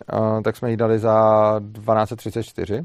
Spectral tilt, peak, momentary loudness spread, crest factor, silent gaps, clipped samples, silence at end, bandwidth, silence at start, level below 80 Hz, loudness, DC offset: -8 dB/octave; -4 dBFS; 12 LU; 16 dB; none; under 0.1%; 0 s; 14 kHz; 0.1 s; -56 dBFS; -20 LUFS; under 0.1%